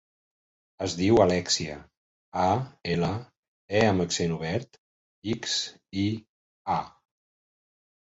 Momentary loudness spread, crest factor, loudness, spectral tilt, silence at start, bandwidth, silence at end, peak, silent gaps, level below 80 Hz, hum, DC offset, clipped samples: 15 LU; 22 dB; -27 LUFS; -4.5 dB/octave; 0.8 s; 8 kHz; 1.2 s; -6 dBFS; 1.97-2.32 s, 3.37-3.68 s, 4.78-5.22 s, 6.29-6.65 s; -52 dBFS; none; under 0.1%; under 0.1%